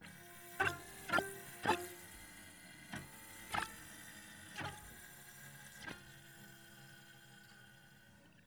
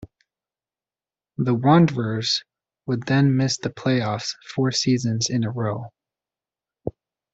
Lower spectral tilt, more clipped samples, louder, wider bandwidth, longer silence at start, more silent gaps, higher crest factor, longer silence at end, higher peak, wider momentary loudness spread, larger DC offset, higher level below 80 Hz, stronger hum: second, -3 dB/octave vs -5.5 dB/octave; neither; second, -44 LUFS vs -22 LUFS; first, over 20 kHz vs 8 kHz; about the same, 0 s vs 0 s; neither; first, 26 dB vs 20 dB; second, 0 s vs 0.45 s; second, -20 dBFS vs -2 dBFS; first, 21 LU vs 18 LU; neither; second, -70 dBFS vs -58 dBFS; neither